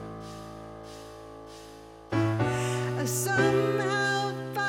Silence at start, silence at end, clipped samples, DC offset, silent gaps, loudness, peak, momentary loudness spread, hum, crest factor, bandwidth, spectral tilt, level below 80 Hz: 0 s; 0 s; under 0.1%; under 0.1%; none; -27 LUFS; -12 dBFS; 21 LU; none; 16 dB; 16.5 kHz; -5 dB/octave; -56 dBFS